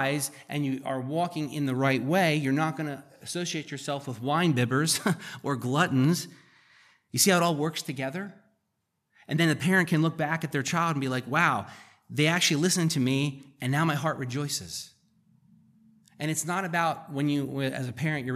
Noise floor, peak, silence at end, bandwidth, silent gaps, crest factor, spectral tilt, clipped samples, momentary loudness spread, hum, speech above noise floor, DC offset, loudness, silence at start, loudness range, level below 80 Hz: -79 dBFS; -8 dBFS; 0 s; 15 kHz; none; 20 dB; -4.5 dB/octave; under 0.1%; 11 LU; none; 52 dB; under 0.1%; -27 LUFS; 0 s; 5 LU; -74 dBFS